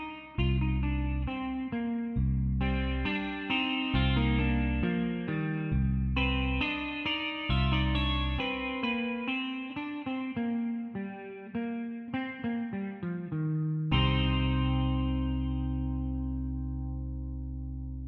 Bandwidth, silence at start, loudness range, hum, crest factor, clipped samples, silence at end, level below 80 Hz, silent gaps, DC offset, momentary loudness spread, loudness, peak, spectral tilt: 4.5 kHz; 0 s; 6 LU; none; 16 dB; under 0.1%; 0 s; -36 dBFS; none; under 0.1%; 9 LU; -31 LUFS; -16 dBFS; -8.5 dB/octave